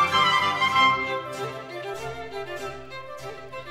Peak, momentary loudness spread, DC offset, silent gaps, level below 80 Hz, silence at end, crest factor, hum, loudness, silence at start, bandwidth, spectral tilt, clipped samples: -8 dBFS; 19 LU; under 0.1%; none; -56 dBFS; 0 s; 18 dB; none; -24 LUFS; 0 s; 16 kHz; -3 dB/octave; under 0.1%